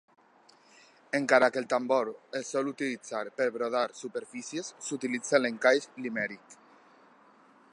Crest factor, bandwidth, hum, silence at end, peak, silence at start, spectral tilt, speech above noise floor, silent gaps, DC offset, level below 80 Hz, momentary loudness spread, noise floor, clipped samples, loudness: 22 dB; 11 kHz; none; 1.2 s; -8 dBFS; 1.15 s; -3.5 dB/octave; 31 dB; none; under 0.1%; -86 dBFS; 13 LU; -61 dBFS; under 0.1%; -30 LUFS